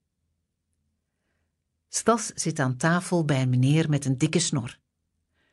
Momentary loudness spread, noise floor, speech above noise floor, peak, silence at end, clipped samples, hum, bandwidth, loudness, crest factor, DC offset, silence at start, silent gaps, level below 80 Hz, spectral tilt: 7 LU; -77 dBFS; 53 dB; -8 dBFS; 0.8 s; under 0.1%; none; 12 kHz; -25 LUFS; 18 dB; under 0.1%; 1.95 s; none; -64 dBFS; -5 dB/octave